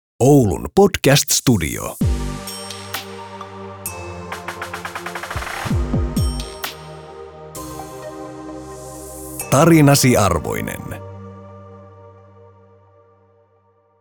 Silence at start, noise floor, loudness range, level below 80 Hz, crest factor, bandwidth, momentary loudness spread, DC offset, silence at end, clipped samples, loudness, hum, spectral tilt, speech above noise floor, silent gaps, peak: 0.2 s; -58 dBFS; 12 LU; -34 dBFS; 18 dB; over 20 kHz; 21 LU; under 0.1%; 1.9 s; under 0.1%; -18 LUFS; none; -5 dB/octave; 43 dB; none; -2 dBFS